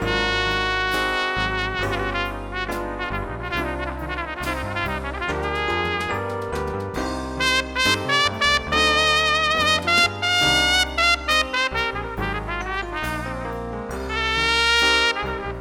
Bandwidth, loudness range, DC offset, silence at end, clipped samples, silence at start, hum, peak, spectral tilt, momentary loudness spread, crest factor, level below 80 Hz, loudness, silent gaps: 18.5 kHz; 8 LU; under 0.1%; 0 s; under 0.1%; 0 s; none; -4 dBFS; -3 dB/octave; 11 LU; 18 dB; -36 dBFS; -21 LUFS; none